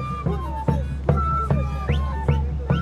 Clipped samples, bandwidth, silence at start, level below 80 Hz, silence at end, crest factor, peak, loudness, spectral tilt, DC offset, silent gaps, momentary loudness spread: under 0.1%; 6.8 kHz; 0 s; -28 dBFS; 0 s; 16 dB; -6 dBFS; -24 LUFS; -8.5 dB/octave; under 0.1%; none; 4 LU